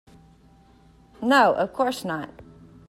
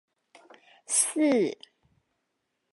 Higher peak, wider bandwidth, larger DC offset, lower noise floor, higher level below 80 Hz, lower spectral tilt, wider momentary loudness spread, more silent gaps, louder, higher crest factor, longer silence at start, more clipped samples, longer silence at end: first, -6 dBFS vs -10 dBFS; first, 16 kHz vs 12 kHz; neither; second, -54 dBFS vs -80 dBFS; first, -58 dBFS vs -84 dBFS; first, -4.5 dB/octave vs -2.5 dB/octave; first, 14 LU vs 10 LU; neither; first, -22 LUFS vs -25 LUFS; about the same, 20 dB vs 20 dB; first, 1.2 s vs 0.9 s; neither; second, 0.45 s vs 1.2 s